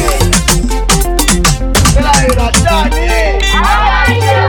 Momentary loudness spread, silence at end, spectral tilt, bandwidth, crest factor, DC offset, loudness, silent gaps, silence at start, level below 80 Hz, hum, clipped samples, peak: 3 LU; 0 s; -3.5 dB/octave; 19.5 kHz; 10 dB; under 0.1%; -10 LUFS; none; 0 s; -14 dBFS; none; 0.4%; 0 dBFS